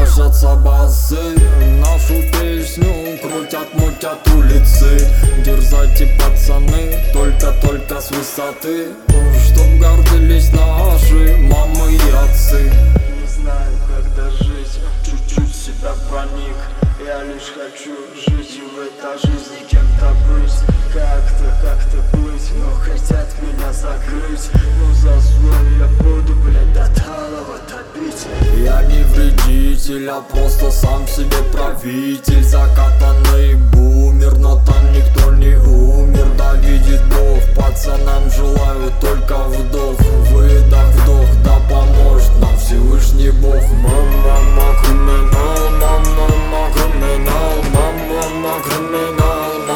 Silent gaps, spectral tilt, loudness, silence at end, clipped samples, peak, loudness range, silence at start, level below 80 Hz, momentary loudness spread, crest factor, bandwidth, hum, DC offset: none; -6 dB/octave; -14 LUFS; 0 s; under 0.1%; 0 dBFS; 8 LU; 0 s; -10 dBFS; 11 LU; 10 dB; 18 kHz; none; under 0.1%